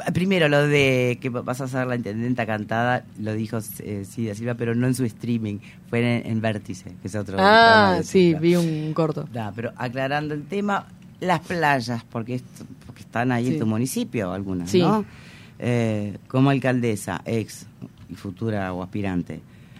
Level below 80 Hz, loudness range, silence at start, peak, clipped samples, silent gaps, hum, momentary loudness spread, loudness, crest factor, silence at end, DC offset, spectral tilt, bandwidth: -58 dBFS; 7 LU; 0 s; -2 dBFS; under 0.1%; none; none; 14 LU; -23 LUFS; 20 dB; 0 s; under 0.1%; -6 dB/octave; 16 kHz